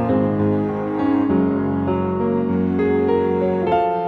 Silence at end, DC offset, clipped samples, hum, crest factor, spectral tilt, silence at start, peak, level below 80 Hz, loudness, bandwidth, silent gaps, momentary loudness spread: 0 s; under 0.1%; under 0.1%; none; 12 dB; -10.5 dB/octave; 0 s; -6 dBFS; -48 dBFS; -19 LUFS; 4.9 kHz; none; 3 LU